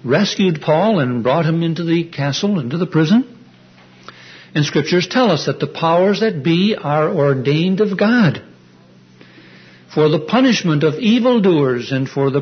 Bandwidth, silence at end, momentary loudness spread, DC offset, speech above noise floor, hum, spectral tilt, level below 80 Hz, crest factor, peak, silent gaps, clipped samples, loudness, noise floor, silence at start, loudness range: 6.6 kHz; 0 s; 6 LU; under 0.1%; 31 dB; none; -6.5 dB/octave; -60 dBFS; 14 dB; -2 dBFS; none; under 0.1%; -16 LUFS; -46 dBFS; 0.05 s; 3 LU